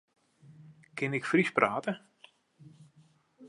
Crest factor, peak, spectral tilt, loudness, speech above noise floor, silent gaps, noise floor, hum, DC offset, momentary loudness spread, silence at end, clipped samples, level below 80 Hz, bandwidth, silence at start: 28 dB; -8 dBFS; -6 dB/octave; -30 LUFS; 35 dB; none; -64 dBFS; none; under 0.1%; 15 LU; 0 s; under 0.1%; -80 dBFS; 11.5 kHz; 0.6 s